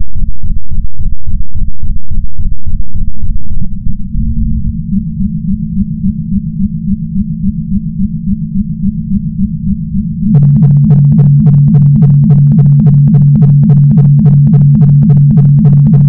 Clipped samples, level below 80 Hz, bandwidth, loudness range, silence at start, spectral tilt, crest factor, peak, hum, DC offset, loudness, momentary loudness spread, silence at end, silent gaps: 3%; -18 dBFS; 1.4 kHz; 14 LU; 0 s; -14.5 dB/octave; 6 dB; 0 dBFS; none; under 0.1%; -9 LUFS; 15 LU; 0 s; none